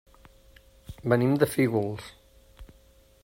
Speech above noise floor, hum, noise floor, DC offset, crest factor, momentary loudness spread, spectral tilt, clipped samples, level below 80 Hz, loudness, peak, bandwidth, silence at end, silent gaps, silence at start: 33 dB; none; -58 dBFS; under 0.1%; 22 dB; 21 LU; -7 dB/octave; under 0.1%; -54 dBFS; -26 LUFS; -8 dBFS; 16 kHz; 0.6 s; none; 0.9 s